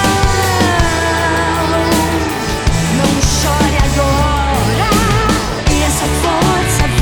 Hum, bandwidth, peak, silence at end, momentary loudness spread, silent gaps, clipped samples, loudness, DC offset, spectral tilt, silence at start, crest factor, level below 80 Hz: none; over 20 kHz; -4 dBFS; 0 s; 3 LU; none; under 0.1%; -13 LUFS; 0.6%; -4.5 dB/octave; 0 s; 10 dB; -20 dBFS